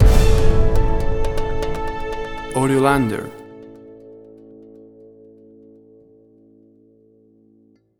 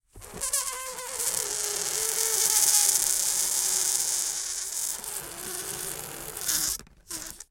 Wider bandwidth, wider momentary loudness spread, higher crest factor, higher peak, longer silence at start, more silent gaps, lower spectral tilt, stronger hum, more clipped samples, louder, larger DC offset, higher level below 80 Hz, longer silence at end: second, 14.5 kHz vs 17 kHz; first, 27 LU vs 15 LU; second, 18 dB vs 28 dB; about the same, 0 dBFS vs 0 dBFS; second, 0 s vs 0.15 s; neither; first, -6.5 dB/octave vs 1 dB/octave; neither; neither; first, -20 LUFS vs -25 LUFS; neither; first, -22 dBFS vs -56 dBFS; first, 4.1 s vs 0.1 s